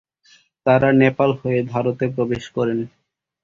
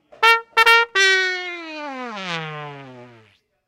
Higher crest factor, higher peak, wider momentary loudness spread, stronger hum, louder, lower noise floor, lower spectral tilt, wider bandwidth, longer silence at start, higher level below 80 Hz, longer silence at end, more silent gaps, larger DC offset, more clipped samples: about the same, 18 dB vs 20 dB; about the same, -2 dBFS vs 0 dBFS; second, 9 LU vs 18 LU; neither; second, -19 LUFS vs -16 LUFS; about the same, -55 dBFS vs -56 dBFS; first, -8 dB/octave vs -1.5 dB/octave; second, 7.4 kHz vs 17 kHz; first, 0.65 s vs 0.2 s; first, -54 dBFS vs -66 dBFS; about the same, 0.55 s vs 0.6 s; neither; neither; neither